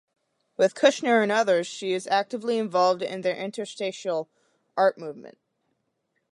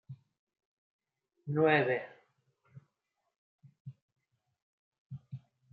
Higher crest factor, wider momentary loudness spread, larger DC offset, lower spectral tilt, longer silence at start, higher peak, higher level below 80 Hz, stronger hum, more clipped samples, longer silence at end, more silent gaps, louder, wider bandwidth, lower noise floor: about the same, 20 dB vs 24 dB; second, 15 LU vs 26 LU; neither; about the same, -4 dB/octave vs -5 dB/octave; first, 0.6 s vs 0.1 s; first, -6 dBFS vs -14 dBFS; about the same, -82 dBFS vs -84 dBFS; neither; neither; first, 1 s vs 0.35 s; second, none vs 0.39-0.47 s, 0.65-0.99 s, 3.38-3.59 s, 3.80-3.85 s, 4.02-4.08 s, 4.62-4.92 s, 4.98-5.10 s; first, -25 LUFS vs -30 LUFS; first, 11.5 kHz vs 4.8 kHz; second, -76 dBFS vs -83 dBFS